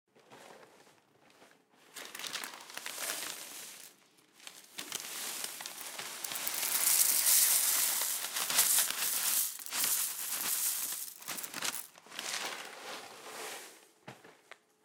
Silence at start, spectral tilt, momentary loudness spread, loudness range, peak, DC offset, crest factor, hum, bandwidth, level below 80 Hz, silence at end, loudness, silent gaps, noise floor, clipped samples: 0.3 s; 2 dB/octave; 20 LU; 15 LU; -12 dBFS; under 0.1%; 24 dB; none; 18 kHz; under -90 dBFS; 0.5 s; -31 LUFS; none; -65 dBFS; under 0.1%